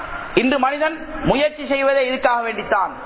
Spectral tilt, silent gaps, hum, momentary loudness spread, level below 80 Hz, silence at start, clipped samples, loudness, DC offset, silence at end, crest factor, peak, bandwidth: -9 dB/octave; none; none; 5 LU; -42 dBFS; 0 s; under 0.1%; -19 LUFS; under 0.1%; 0 s; 18 dB; -2 dBFS; 4 kHz